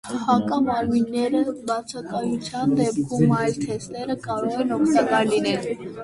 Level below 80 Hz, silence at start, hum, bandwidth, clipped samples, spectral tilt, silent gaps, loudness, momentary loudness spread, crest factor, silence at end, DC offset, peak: -54 dBFS; 0.05 s; none; 11.5 kHz; under 0.1%; -6 dB/octave; none; -23 LUFS; 9 LU; 16 dB; 0 s; under 0.1%; -6 dBFS